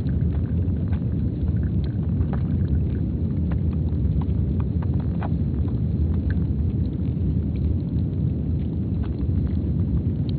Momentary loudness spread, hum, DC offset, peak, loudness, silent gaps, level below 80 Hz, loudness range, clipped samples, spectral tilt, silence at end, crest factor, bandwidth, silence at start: 2 LU; none; under 0.1%; -10 dBFS; -24 LUFS; none; -28 dBFS; 1 LU; under 0.1%; -11 dB/octave; 0 s; 12 dB; 4.5 kHz; 0 s